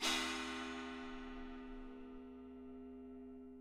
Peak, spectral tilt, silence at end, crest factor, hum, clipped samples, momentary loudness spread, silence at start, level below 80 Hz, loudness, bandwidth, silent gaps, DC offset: -24 dBFS; -1.5 dB/octave; 0 s; 22 dB; none; under 0.1%; 14 LU; 0 s; -60 dBFS; -47 LUFS; 16 kHz; none; under 0.1%